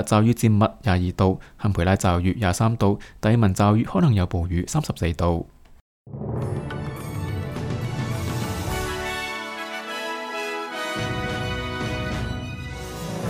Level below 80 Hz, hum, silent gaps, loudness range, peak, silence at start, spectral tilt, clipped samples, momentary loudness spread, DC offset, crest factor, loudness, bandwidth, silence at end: -40 dBFS; none; 5.81-6.05 s; 7 LU; -6 dBFS; 0 s; -6 dB/octave; under 0.1%; 12 LU; under 0.1%; 18 dB; -24 LUFS; 16 kHz; 0 s